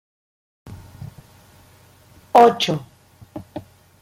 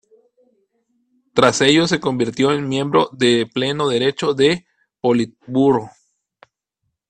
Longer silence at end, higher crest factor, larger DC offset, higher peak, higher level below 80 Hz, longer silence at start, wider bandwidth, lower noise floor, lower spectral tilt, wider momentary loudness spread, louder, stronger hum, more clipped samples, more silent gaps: second, 0.4 s vs 1.2 s; about the same, 22 dB vs 18 dB; neither; about the same, -2 dBFS vs 0 dBFS; about the same, -58 dBFS vs -56 dBFS; second, 0.7 s vs 1.35 s; first, 16.5 kHz vs 9.4 kHz; second, -51 dBFS vs -75 dBFS; about the same, -5 dB/octave vs -4.5 dB/octave; first, 27 LU vs 7 LU; about the same, -16 LUFS vs -17 LUFS; neither; neither; neither